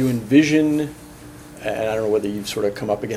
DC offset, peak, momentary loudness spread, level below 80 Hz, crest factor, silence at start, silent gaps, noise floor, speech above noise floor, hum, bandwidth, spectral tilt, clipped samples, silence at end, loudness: under 0.1%; -2 dBFS; 24 LU; -50 dBFS; 20 dB; 0 s; none; -40 dBFS; 20 dB; none; 15.5 kHz; -6 dB/octave; under 0.1%; 0 s; -20 LUFS